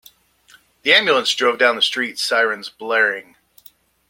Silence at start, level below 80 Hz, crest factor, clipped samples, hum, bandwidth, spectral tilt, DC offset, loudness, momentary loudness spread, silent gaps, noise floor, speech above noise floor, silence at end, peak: 0.85 s; -70 dBFS; 20 dB; under 0.1%; none; 16.5 kHz; -1 dB/octave; under 0.1%; -17 LUFS; 9 LU; none; -53 dBFS; 35 dB; 0.9 s; 0 dBFS